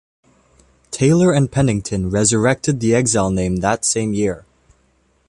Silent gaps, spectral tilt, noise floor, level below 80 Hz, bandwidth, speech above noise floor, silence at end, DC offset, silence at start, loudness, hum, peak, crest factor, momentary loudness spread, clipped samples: none; -5 dB/octave; -60 dBFS; -40 dBFS; 11.5 kHz; 43 dB; 0.9 s; under 0.1%; 0.9 s; -17 LUFS; none; -2 dBFS; 16 dB; 7 LU; under 0.1%